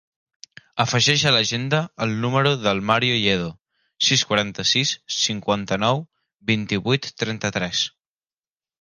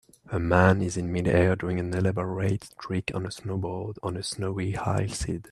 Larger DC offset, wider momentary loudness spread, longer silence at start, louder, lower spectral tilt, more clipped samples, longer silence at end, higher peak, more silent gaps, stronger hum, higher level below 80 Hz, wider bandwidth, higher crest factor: neither; second, 8 LU vs 11 LU; first, 0.75 s vs 0.25 s; first, -20 LUFS vs -27 LUFS; second, -3.5 dB/octave vs -6 dB/octave; neither; first, 0.95 s vs 0.1 s; about the same, -4 dBFS vs -4 dBFS; first, 3.61-3.65 s, 6.34-6.38 s vs none; neither; second, -54 dBFS vs -48 dBFS; about the same, 11 kHz vs 12 kHz; about the same, 20 dB vs 22 dB